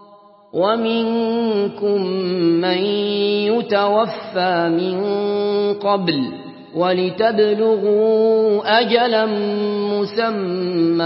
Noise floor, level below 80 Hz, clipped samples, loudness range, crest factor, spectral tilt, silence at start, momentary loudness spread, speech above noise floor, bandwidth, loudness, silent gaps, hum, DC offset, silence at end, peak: -46 dBFS; -70 dBFS; under 0.1%; 3 LU; 16 dB; -10.5 dB/octave; 0.55 s; 5 LU; 29 dB; 5.8 kHz; -18 LUFS; none; none; under 0.1%; 0 s; 0 dBFS